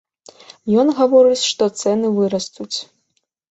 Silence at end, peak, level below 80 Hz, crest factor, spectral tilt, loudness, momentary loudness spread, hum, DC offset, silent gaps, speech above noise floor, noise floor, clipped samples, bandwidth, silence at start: 0.65 s; -2 dBFS; -62 dBFS; 16 dB; -4.5 dB/octave; -17 LUFS; 14 LU; none; under 0.1%; none; 54 dB; -69 dBFS; under 0.1%; 8.2 kHz; 0.65 s